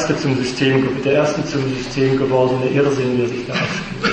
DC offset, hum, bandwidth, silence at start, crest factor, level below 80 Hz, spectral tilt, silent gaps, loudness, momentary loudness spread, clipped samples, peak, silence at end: under 0.1%; none; 8.8 kHz; 0 s; 14 dB; -44 dBFS; -6 dB/octave; none; -18 LUFS; 5 LU; under 0.1%; -4 dBFS; 0 s